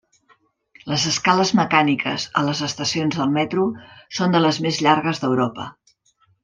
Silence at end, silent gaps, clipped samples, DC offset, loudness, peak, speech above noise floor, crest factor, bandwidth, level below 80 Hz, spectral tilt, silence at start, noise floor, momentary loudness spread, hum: 0.7 s; none; under 0.1%; under 0.1%; -20 LUFS; -2 dBFS; 42 dB; 20 dB; 9.8 kHz; -60 dBFS; -4.5 dB/octave; 0.85 s; -62 dBFS; 8 LU; none